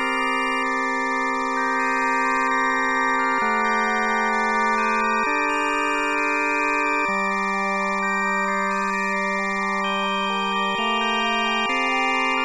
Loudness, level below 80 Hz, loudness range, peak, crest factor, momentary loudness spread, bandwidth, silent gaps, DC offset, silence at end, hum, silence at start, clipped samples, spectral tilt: -21 LUFS; -54 dBFS; 2 LU; -10 dBFS; 12 dB; 2 LU; 12.5 kHz; none; 0.4%; 0 s; none; 0 s; under 0.1%; -3.5 dB/octave